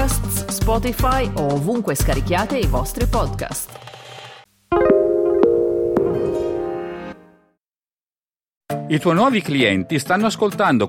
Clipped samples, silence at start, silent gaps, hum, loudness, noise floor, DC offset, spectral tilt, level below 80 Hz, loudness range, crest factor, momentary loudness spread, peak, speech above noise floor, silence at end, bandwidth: under 0.1%; 0 s; 8.57-8.61 s; none; -19 LUFS; under -90 dBFS; under 0.1%; -5.5 dB/octave; -30 dBFS; 4 LU; 18 dB; 15 LU; -2 dBFS; over 72 dB; 0 s; 17 kHz